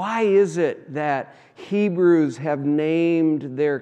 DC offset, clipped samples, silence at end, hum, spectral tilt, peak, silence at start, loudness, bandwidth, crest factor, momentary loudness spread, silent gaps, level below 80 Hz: under 0.1%; under 0.1%; 0 s; none; -7.5 dB/octave; -8 dBFS; 0 s; -21 LUFS; 9 kHz; 14 dB; 9 LU; none; -80 dBFS